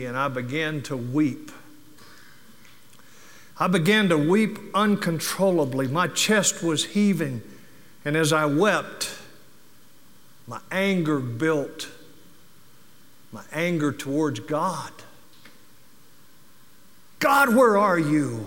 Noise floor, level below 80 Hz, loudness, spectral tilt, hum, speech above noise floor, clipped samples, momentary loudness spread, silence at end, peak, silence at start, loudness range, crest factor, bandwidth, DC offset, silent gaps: -56 dBFS; -70 dBFS; -23 LUFS; -4.5 dB/octave; none; 33 dB; under 0.1%; 15 LU; 0 s; -6 dBFS; 0 s; 8 LU; 18 dB; 17 kHz; 0.5%; none